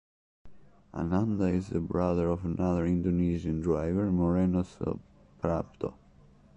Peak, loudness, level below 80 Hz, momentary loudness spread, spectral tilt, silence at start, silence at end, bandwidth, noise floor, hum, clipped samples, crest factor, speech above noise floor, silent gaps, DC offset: -14 dBFS; -30 LUFS; -44 dBFS; 9 LU; -9.5 dB/octave; 0.45 s; 0.65 s; 8.2 kHz; -58 dBFS; none; under 0.1%; 16 dB; 29 dB; none; under 0.1%